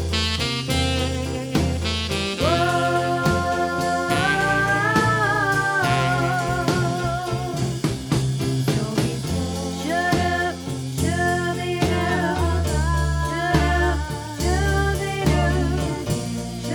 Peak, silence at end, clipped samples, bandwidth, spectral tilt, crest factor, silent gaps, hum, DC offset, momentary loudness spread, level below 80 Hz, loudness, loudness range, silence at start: -6 dBFS; 0 s; under 0.1%; 18.5 kHz; -5 dB/octave; 16 dB; none; none; under 0.1%; 6 LU; -32 dBFS; -22 LUFS; 3 LU; 0 s